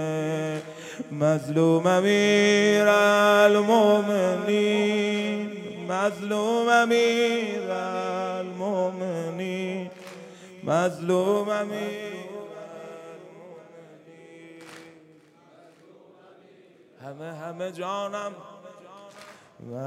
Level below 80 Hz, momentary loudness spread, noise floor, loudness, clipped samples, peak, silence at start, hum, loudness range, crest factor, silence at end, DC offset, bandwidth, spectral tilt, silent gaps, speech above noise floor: -80 dBFS; 23 LU; -55 dBFS; -23 LUFS; under 0.1%; -6 dBFS; 0 s; none; 18 LU; 20 dB; 0 s; under 0.1%; 15.5 kHz; -5 dB/octave; none; 32 dB